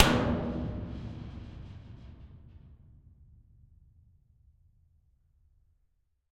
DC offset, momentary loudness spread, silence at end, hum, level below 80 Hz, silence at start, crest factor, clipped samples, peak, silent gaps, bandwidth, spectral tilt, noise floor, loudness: under 0.1%; 25 LU; 3.6 s; none; -48 dBFS; 0 s; 32 dB; under 0.1%; -4 dBFS; none; 11.5 kHz; -5.5 dB/octave; -73 dBFS; -34 LUFS